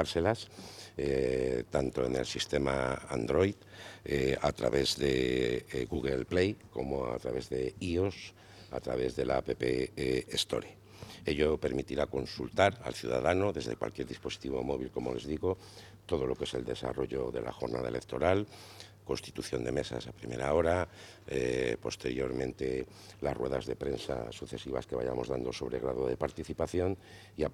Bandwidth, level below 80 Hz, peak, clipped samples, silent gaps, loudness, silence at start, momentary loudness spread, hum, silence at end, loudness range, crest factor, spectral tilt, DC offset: 15.5 kHz; -52 dBFS; -10 dBFS; under 0.1%; none; -34 LUFS; 0 s; 11 LU; none; 0 s; 4 LU; 24 dB; -5.5 dB/octave; under 0.1%